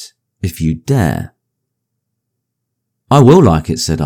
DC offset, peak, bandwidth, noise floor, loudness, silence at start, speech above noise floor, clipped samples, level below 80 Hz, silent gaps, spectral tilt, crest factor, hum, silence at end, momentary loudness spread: under 0.1%; 0 dBFS; 17 kHz; -74 dBFS; -11 LUFS; 0 s; 64 dB; 0.8%; -38 dBFS; none; -6.5 dB/octave; 14 dB; none; 0 s; 17 LU